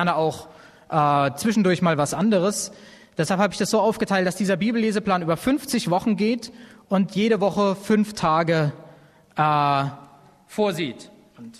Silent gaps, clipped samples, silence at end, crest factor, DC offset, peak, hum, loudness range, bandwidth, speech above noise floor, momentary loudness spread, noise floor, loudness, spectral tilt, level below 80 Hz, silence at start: none; under 0.1%; 0.1 s; 18 dB; under 0.1%; -4 dBFS; none; 1 LU; 13.5 kHz; 29 dB; 9 LU; -50 dBFS; -22 LUFS; -5.5 dB/octave; -58 dBFS; 0 s